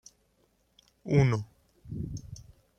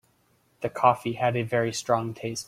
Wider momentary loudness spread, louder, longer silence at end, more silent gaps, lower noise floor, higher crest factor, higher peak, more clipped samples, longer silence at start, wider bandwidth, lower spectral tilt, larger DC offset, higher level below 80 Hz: first, 23 LU vs 10 LU; second, -29 LUFS vs -26 LUFS; first, 0.35 s vs 0.05 s; neither; first, -70 dBFS vs -66 dBFS; about the same, 22 dB vs 22 dB; second, -10 dBFS vs -6 dBFS; neither; first, 1.05 s vs 0.6 s; second, 8.4 kHz vs 15.5 kHz; first, -7.5 dB/octave vs -5 dB/octave; neither; first, -52 dBFS vs -64 dBFS